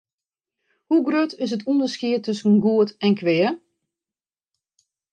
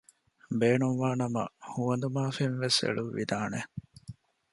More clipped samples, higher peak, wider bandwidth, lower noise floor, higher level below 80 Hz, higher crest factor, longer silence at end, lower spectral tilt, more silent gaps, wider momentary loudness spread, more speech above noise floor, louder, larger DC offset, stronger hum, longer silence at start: neither; first, -8 dBFS vs -12 dBFS; second, 9 kHz vs 11.5 kHz; first, under -90 dBFS vs -50 dBFS; second, -74 dBFS vs -66 dBFS; second, 14 dB vs 20 dB; first, 1.55 s vs 0.4 s; first, -6.5 dB/octave vs -5 dB/octave; neither; second, 6 LU vs 16 LU; first, over 70 dB vs 20 dB; first, -21 LUFS vs -30 LUFS; neither; neither; first, 0.9 s vs 0.5 s